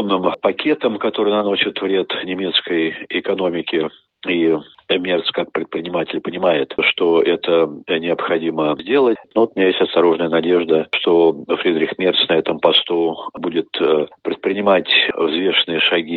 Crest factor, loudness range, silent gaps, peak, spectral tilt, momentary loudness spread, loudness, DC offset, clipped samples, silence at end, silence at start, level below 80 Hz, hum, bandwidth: 16 dB; 4 LU; none; 0 dBFS; -7.5 dB/octave; 8 LU; -17 LUFS; under 0.1%; under 0.1%; 0 s; 0 s; -64 dBFS; none; 4.6 kHz